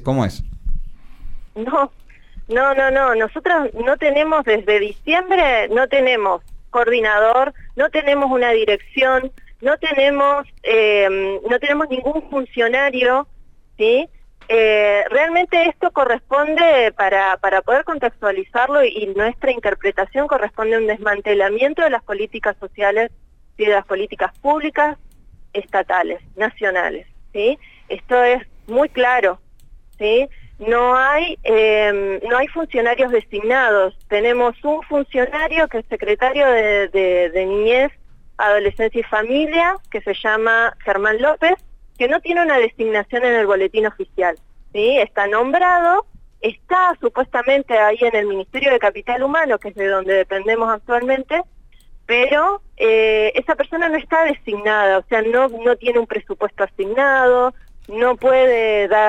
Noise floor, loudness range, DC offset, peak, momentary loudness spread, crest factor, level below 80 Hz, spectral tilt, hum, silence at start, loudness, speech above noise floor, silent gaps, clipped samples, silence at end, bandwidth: -43 dBFS; 3 LU; under 0.1%; -4 dBFS; 8 LU; 14 dB; -40 dBFS; -5.5 dB/octave; none; 0 s; -17 LUFS; 26 dB; none; under 0.1%; 0 s; 9 kHz